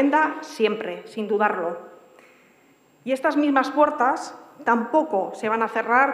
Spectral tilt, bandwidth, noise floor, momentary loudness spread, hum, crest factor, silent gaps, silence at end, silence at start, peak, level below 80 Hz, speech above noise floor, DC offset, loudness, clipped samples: -5 dB/octave; 12.5 kHz; -57 dBFS; 11 LU; none; 18 dB; none; 0 s; 0 s; -6 dBFS; -80 dBFS; 35 dB; under 0.1%; -23 LUFS; under 0.1%